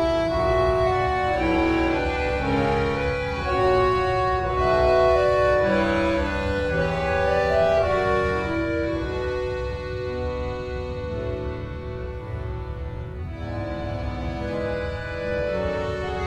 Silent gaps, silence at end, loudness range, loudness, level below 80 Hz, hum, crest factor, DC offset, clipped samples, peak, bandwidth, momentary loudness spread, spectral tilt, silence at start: none; 0 s; 10 LU; -24 LUFS; -34 dBFS; none; 14 dB; under 0.1%; under 0.1%; -8 dBFS; 11.5 kHz; 12 LU; -7 dB/octave; 0 s